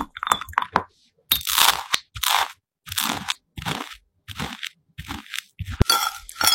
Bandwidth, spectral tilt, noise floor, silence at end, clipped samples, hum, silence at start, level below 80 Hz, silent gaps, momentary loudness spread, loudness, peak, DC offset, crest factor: 17 kHz; -1.5 dB/octave; -47 dBFS; 0 s; under 0.1%; none; 0 s; -40 dBFS; none; 18 LU; -23 LUFS; 0 dBFS; under 0.1%; 26 dB